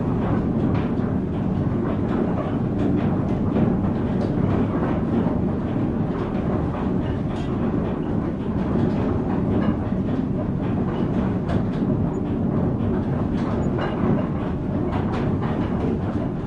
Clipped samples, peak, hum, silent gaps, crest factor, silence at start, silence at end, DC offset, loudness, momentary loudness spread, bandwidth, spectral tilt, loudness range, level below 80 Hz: under 0.1%; -8 dBFS; none; none; 14 dB; 0 s; 0 s; under 0.1%; -23 LUFS; 3 LU; 7.4 kHz; -10 dB/octave; 2 LU; -36 dBFS